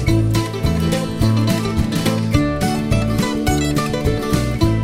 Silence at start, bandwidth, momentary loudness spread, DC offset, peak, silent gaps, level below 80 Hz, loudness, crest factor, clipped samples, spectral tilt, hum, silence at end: 0 s; 16 kHz; 3 LU; under 0.1%; -2 dBFS; none; -28 dBFS; -18 LUFS; 16 dB; under 0.1%; -6 dB/octave; none; 0 s